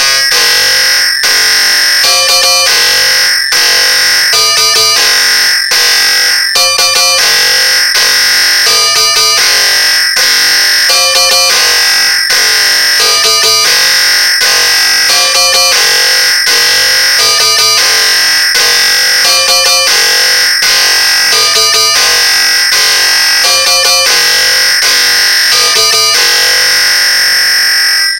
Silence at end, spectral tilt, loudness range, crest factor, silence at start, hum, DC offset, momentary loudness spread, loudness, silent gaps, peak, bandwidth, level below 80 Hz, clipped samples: 0 s; 2.5 dB/octave; 0 LU; 8 dB; 0 s; none; 0.4%; 1 LU; -4 LUFS; none; 0 dBFS; over 20 kHz; -44 dBFS; 0.8%